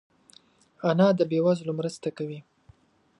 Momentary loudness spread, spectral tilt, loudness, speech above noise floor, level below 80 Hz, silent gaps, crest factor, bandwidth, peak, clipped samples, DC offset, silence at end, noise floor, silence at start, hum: 15 LU; -7.5 dB/octave; -26 LUFS; 34 dB; -72 dBFS; none; 20 dB; 11 kHz; -8 dBFS; under 0.1%; under 0.1%; 0.8 s; -59 dBFS; 0.85 s; none